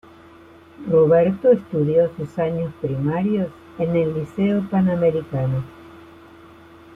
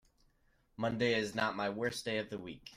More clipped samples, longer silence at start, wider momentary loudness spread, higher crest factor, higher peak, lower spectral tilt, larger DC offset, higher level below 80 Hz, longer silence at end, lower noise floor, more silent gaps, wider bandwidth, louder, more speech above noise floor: neither; about the same, 0.8 s vs 0.8 s; about the same, 10 LU vs 8 LU; about the same, 16 dB vs 18 dB; first, -6 dBFS vs -20 dBFS; first, -10 dB/octave vs -4.5 dB/octave; neither; first, -54 dBFS vs -68 dBFS; first, 0.9 s vs 0 s; second, -46 dBFS vs -72 dBFS; neither; second, 4.4 kHz vs 16 kHz; first, -20 LUFS vs -36 LUFS; second, 27 dB vs 36 dB